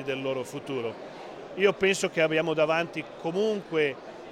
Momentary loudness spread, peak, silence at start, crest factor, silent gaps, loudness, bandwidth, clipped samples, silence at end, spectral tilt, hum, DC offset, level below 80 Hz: 15 LU; -10 dBFS; 0 s; 18 dB; none; -27 LUFS; 13.5 kHz; under 0.1%; 0 s; -4.5 dB/octave; none; under 0.1%; -66 dBFS